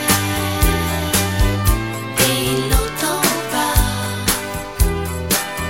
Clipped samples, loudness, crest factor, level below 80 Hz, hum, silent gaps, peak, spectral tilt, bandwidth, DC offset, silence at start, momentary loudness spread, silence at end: under 0.1%; -18 LUFS; 18 dB; -24 dBFS; none; none; 0 dBFS; -3.5 dB/octave; 16.5 kHz; 0.5%; 0 s; 4 LU; 0 s